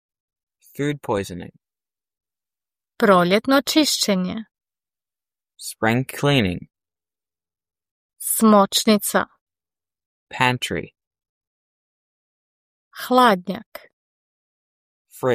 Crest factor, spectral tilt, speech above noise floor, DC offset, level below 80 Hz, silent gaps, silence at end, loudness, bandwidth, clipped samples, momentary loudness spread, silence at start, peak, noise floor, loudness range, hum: 22 dB; -4 dB/octave; over 71 dB; under 0.1%; -60 dBFS; 7.91-8.09 s, 9.41-9.47 s, 10.06-10.27 s, 11.07-11.11 s, 11.29-11.41 s, 11.47-12.91 s, 13.66-13.72 s, 13.93-15.05 s; 0 s; -19 LUFS; 15.5 kHz; under 0.1%; 18 LU; 0.8 s; -2 dBFS; under -90 dBFS; 6 LU; none